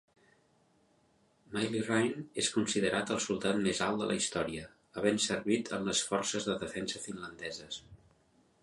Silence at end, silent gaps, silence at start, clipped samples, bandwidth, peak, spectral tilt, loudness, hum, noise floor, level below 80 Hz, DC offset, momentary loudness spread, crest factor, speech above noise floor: 0.65 s; none; 1.5 s; under 0.1%; 11.5 kHz; -14 dBFS; -3.5 dB/octave; -33 LUFS; none; -70 dBFS; -66 dBFS; under 0.1%; 11 LU; 22 dB; 36 dB